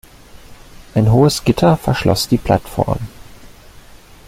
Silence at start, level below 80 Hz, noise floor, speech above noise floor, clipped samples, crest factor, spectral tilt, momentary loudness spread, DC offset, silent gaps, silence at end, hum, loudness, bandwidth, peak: 0.35 s; -36 dBFS; -40 dBFS; 26 dB; under 0.1%; 16 dB; -6 dB/octave; 9 LU; under 0.1%; none; 0.8 s; none; -15 LUFS; 16 kHz; 0 dBFS